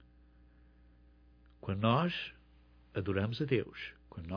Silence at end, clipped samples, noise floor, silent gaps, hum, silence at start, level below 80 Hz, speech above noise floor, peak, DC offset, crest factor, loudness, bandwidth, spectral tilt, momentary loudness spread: 0 s; under 0.1%; -62 dBFS; none; none; 1.65 s; -62 dBFS; 29 dB; -14 dBFS; under 0.1%; 22 dB; -35 LUFS; 5.4 kHz; -8.5 dB/octave; 16 LU